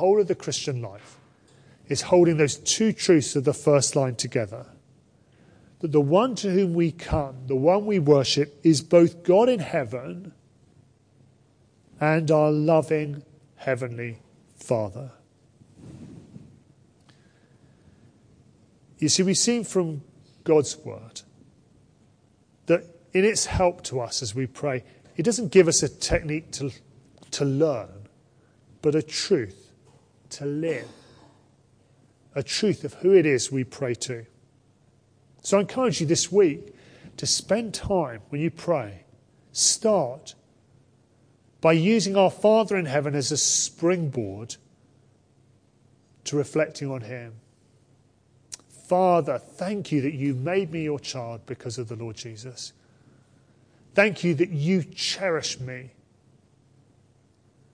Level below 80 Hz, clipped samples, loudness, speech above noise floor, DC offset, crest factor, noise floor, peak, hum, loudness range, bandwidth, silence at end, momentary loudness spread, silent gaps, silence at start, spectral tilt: -52 dBFS; under 0.1%; -24 LUFS; 38 dB; under 0.1%; 22 dB; -61 dBFS; -4 dBFS; none; 9 LU; 10.5 kHz; 1.85 s; 18 LU; none; 0 s; -4.5 dB/octave